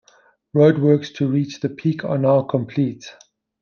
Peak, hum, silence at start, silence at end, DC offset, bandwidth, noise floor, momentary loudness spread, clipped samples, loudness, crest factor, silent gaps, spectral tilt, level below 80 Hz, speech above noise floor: -2 dBFS; none; 0.55 s; 0.5 s; under 0.1%; 7 kHz; -56 dBFS; 10 LU; under 0.1%; -19 LUFS; 18 dB; none; -8 dB/octave; -64 dBFS; 38 dB